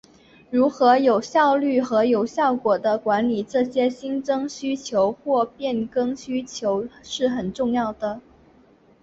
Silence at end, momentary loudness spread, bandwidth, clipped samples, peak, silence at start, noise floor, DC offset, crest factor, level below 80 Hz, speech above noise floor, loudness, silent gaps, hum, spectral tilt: 0.8 s; 10 LU; 7.8 kHz; under 0.1%; -4 dBFS; 0.5 s; -55 dBFS; under 0.1%; 18 dB; -60 dBFS; 33 dB; -22 LUFS; none; none; -5 dB/octave